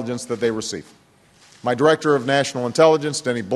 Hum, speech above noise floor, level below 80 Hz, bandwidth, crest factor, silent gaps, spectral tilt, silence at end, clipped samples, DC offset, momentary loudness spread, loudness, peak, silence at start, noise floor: none; 33 dB; -62 dBFS; 12.5 kHz; 18 dB; none; -4.5 dB/octave; 0 s; under 0.1%; under 0.1%; 12 LU; -19 LUFS; -2 dBFS; 0 s; -53 dBFS